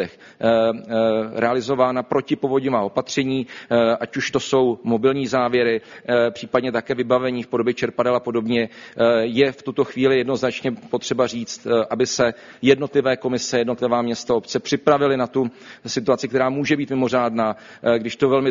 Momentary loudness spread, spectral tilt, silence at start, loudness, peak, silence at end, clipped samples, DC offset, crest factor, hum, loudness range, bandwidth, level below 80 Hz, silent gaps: 6 LU; -4 dB/octave; 0 s; -21 LUFS; -2 dBFS; 0 s; under 0.1%; under 0.1%; 18 dB; none; 1 LU; 7.4 kHz; -58 dBFS; none